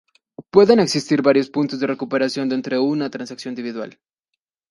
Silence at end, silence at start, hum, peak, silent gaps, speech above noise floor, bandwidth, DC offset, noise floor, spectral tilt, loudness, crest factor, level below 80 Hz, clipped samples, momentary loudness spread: 0.8 s; 0.4 s; none; 0 dBFS; none; 62 dB; 11.5 kHz; under 0.1%; -80 dBFS; -5.5 dB/octave; -19 LUFS; 20 dB; -62 dBFS; under 0.1%; 15 LU